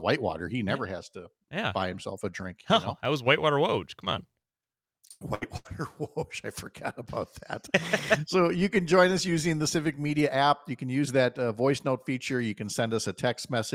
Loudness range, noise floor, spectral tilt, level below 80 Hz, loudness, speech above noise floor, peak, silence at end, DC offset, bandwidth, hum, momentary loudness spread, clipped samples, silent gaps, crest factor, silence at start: 9 LU; under -90 dBFS; -5 dB/octave; -60 dBFS; -28 LUFS; over 62 dB; -6 dBFS; 0 s; under 0.1%; 16.5 kHz; none; 14 LU; under 0.1%; none; 22 dB; 0 s